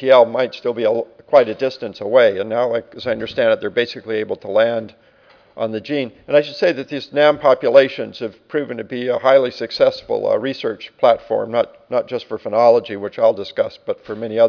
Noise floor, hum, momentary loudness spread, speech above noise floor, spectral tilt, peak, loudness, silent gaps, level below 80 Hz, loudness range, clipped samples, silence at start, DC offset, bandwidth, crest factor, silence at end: -51 dBFS; none; 12 LU; 34 dB; -6 dB/octave; 0 dBFS; -18 LUFS; none; -62 dBFS; 4 LU; under 0.1%; 0 s; under 0.1%; 5.4 kHz; 16 dB; 0 s